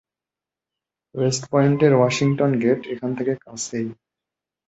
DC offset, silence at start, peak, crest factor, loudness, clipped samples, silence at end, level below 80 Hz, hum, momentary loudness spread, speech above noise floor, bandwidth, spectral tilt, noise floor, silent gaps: under 0.1%; 1.15 s; -4 dBFS; 18 dB; -21 LUFS; under 0.1%; 0.75 s; -62 dBFS; none; 12 LU; 69 dB; 8.2 kHz; -6 dB/octave; -89 dBFS; none